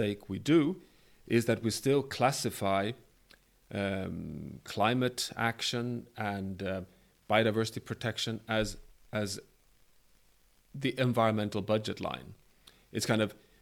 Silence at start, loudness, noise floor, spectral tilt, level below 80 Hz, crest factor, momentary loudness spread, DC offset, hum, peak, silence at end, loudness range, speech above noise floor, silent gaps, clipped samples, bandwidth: 0 s; -32 LUFS; -65 dBFS; -5 dB/octave; -60 dBFS; 22 dB; 13 LU; under 0.1%; none; -12 dBFS; 0.3 s; 3 LU; 34 dB; none; under 0.1%; 18 kHz